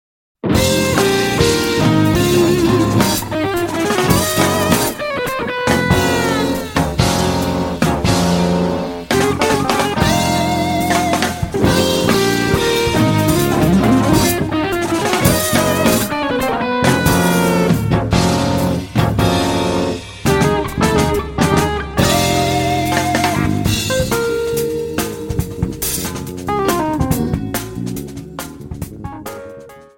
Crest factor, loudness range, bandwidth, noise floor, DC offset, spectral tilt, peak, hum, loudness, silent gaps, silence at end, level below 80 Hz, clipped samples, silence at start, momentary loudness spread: 16 dB; 5 LU; 17 kHz; -36 dBFS; under 0.1%; -5 dB/octave; 0 dBFS; none; -15 LUFS; none; 0.15 s; -32 dBFS; under 0.1%; 0.45 s; 8 LU